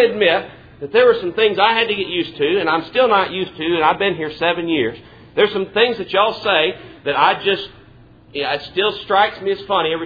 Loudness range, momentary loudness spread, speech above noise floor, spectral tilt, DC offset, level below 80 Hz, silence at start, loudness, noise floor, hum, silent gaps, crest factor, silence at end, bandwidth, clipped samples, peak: 2 LU; 9 LU; 28 dB; -6.5 dB/octave; under 0.1%; -54 dBFS; 0 s; -17 LUFS; -45 dBFS; none; none; 18 dB; 0 s; 5 kHz; under 0.1%; 0 dBFS